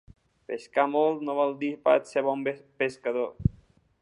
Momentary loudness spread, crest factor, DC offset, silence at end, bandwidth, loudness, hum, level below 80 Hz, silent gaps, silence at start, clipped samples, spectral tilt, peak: 7 LU; 20 dB; under 0.1%; 0.5 s; 11 kHz; -27 LUFS; none; -48 dBFS; none; 0.5 s; under 0.1%; -7 dB/octave; -8 dBFS